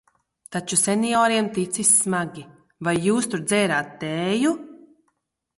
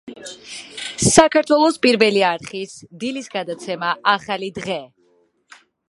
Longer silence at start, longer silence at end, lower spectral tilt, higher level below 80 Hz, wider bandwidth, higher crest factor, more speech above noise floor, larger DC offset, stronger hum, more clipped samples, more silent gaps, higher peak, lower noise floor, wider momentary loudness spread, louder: first, 0.5 s vs 0.05 s; second, 0.8 s vs 1 s; about the same, -3.5 dB/octave vs -3.5 dB/octave; second, -64 dBFS vs -50 dBFS; about the same, 12 kHz vs 11.5 kHz; about the same, 18 dB vs 20 dB; first, 51 dB vs 42 dB; neither; neither; neither; neither; second, -4 dBFS vs 0 dBFS; first, -73 dBFS vs -60 dBFS; second, 14 LU vs 19 LU; second, -21 LUFS vs -18 LUFS